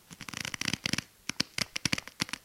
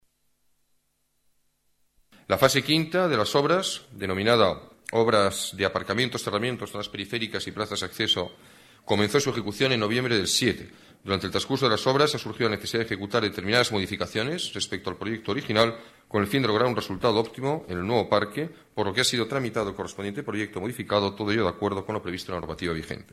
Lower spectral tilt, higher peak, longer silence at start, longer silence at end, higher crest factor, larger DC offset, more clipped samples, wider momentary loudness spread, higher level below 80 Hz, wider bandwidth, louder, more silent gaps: second, -2 dB/octave vs -4 dB/octave; about the same, -6 dBFS vs -4 dBFS; second, 0.1 s vs 2.3 s; about the same, 0.05 s vs 0.1 s; first, 30 dB vs 22 dB; neither; neither; second, 7 LU vs 10 LU; about the same, -60 dBFS vs -58 dBFS; first, 17 kHz vs 14.5 kHz; second, -33 LUFS vs -26 LUFS; neither